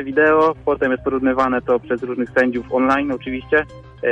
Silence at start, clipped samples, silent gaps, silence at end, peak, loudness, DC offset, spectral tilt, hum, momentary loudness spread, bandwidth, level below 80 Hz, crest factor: 0 s; under 0.1%; none; 0 s; -2 dBFS; -18 LUFS; under 0.1%; -7 dB/octave; none; 9 LU; 8.4 kHz; -44 dBFS; 16 dB